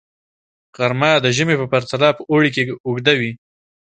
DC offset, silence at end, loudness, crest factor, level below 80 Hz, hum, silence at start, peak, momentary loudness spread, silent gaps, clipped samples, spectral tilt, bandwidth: under 0.1%; 0.5 s; -17 LUFS; 18 dB; -58 dBFS; none; 0.8 s; 0 dBFS; 7 LU; 2.80-2.84 s; under 0.1%; -5 dB/octave; 9.2 kHz